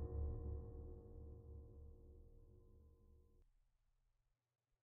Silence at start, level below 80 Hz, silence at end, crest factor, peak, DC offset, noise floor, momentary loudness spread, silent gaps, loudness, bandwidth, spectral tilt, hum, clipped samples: 0 s; -56 dBFS; 1.3 s; 18 dB; -36 dBFS; under 0.1%; -85 dBFS; 20 LU; none; -54 LUFS; 1.9 kHz; -9.5 dB/octave; none; under 0.1%